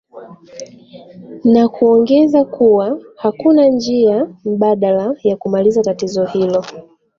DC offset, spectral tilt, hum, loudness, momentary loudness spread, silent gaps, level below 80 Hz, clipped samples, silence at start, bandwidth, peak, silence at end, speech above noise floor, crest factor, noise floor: under 0.1%; -7 dB/octave; none; -14 LUFS; 10 LU; none; -56 dBFS; under 0.1%; 0.15 s; 7.4 kHz; -2 dBFS; 0.4 s; 25 dB; 12 dB; -38 dBFS